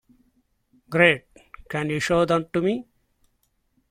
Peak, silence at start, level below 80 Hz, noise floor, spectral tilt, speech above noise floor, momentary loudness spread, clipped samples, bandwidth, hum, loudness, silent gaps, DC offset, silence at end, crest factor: -2 dBFS; 0.9 s; -54 dBFS; -70 dBFS; -5.5 dB/octave; 48 dB; 11 LU; under 0.1%; 15.5 kHz; none; -22 LUFS; none; under 0.1%; 1.1 s; 24 dB